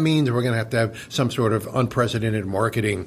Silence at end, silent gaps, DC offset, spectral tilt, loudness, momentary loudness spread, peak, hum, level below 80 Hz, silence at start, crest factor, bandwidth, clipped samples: 0 s; none; under 0.1%; -6 dB/octave; -22 LUFS; 4 LU; -8 dBFS; none; -52 dBFS; 0 s; 14 dB; 15.5 kHz; under 0.1%